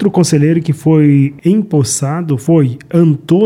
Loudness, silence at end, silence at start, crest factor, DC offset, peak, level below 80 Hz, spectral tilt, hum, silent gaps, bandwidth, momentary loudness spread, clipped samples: -12 LUFS; 0 s; 0 s; 10 dB; under 0.1%; 0 dBFS; -52 dBFS; -6.5 dB/octave; none; none; 14.5 kHz; 5 LU; under 0.1%